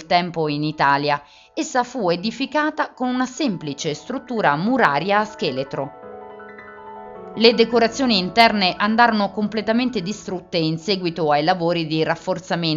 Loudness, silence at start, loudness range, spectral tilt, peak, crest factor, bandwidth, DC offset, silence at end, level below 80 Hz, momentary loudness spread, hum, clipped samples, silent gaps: -20 LUFS; 0 s; 5 LU; -3 dB/octave; 0 dBFS; 20 dB; 8 kHz; under 0.1%; 0 s; -56 dBFS; 17 LU; none; under 0.1%; none